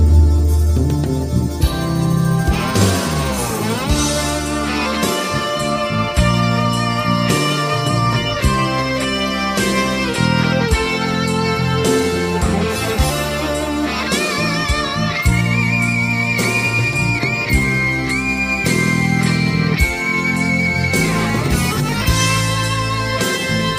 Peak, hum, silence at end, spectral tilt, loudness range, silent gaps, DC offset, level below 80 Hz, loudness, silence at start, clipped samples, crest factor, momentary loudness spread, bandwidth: -2 dBFS; none; 0 s; -4.5 dB/octave; 2 LU; none; under 0.1%; -24 dBFS; -17 LUFS; 0 s; under 0.1%; 14 dB; 3 LU; 15.5 kHz